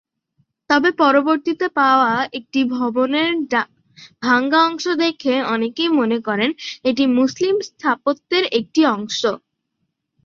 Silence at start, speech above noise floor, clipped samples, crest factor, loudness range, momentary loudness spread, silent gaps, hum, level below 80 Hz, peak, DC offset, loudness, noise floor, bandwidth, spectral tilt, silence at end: 0.7 s; 56 dB; under 0.1%; 16 dB; 2 LU; 7 LU; none; none; -64 dBFS; -2 dBFS; under 0.1%; -18 LUFS; -74 dBFS; 7.4 kHz; -4 dB/octave; 0.9 s